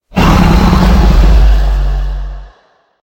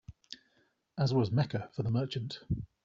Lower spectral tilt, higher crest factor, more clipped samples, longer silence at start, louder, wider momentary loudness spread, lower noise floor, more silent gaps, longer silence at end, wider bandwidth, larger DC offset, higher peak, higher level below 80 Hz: about the same, -7 dB/octave vs -7 dB/octave; second, 8 dB vs 16 dB; first, 0.9% vs under 0.1%; about the same, 0.15 s vs 0.1 s; first, -10 LUFS vs -33 LUFS; second, 13 LU vs 20 LU; second, -50 dBFS vs -73 dBFS; neither; first, 0.55 s vs 0.2 s; first, 16.5 kHz vs 7.6 kHz; neither; first, 0 dBFS vs -18 dBFS; first, -10 dBFS vs -56 dBFS